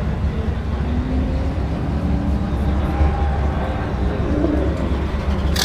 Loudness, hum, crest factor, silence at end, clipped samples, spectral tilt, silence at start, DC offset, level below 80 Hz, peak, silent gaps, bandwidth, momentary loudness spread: -21 LUFS; none; 16 dB; 0 s; under 0.1%; -6.5 dB/octave; 0 s; under 0.1%; -22 dBFS; -4 dBFS; none; 13.5 kHz; 4 LU